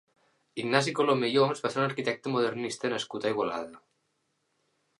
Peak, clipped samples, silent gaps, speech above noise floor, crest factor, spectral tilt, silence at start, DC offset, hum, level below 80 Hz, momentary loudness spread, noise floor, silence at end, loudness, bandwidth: -6 dBFS; under 0.1%; none; 48 dB; 24 dB; -5 dB/octave; 0.55 s; under 0.1%; none; -76 dBFS; 10 LU; -76 dBFS; 1.2 s; -29 LUFS; 11.5 kHz